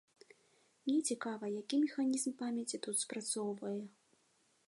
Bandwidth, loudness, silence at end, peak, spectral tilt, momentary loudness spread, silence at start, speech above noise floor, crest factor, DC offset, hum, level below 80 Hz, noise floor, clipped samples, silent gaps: 11.5 kHz; -38 LUFS; 0.8 s; -24 dBFS; -3 dB/octave; 8 LU; 0.85 s; 37 dB; 16 dB; under 0.1%; none; under -90 dBFS; -75 dBFS; under 0.1%; none